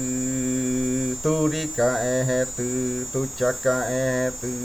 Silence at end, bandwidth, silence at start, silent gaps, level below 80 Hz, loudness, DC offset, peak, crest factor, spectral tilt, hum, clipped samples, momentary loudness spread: 0 s; 19.5 kHz; 0 s; none; -48 dBFS; -24 LUFS; under 0.1%; -10 dBFS; 14 dB; -4.5 dB/octave; none; under 0.1%; 4 LU